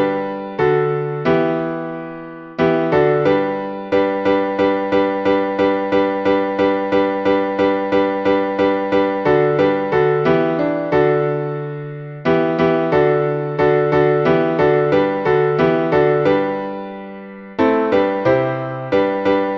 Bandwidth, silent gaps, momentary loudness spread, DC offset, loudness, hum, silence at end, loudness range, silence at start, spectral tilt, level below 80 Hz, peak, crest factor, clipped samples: 6.6 kHz; none; 10 LU; under 0.1%; -17 LUFS; none; 0 s; 3 LU; 0 s; -8.5 dB/octave; -48 dBFS; -2 dBFS; 14 dB; under 0.1%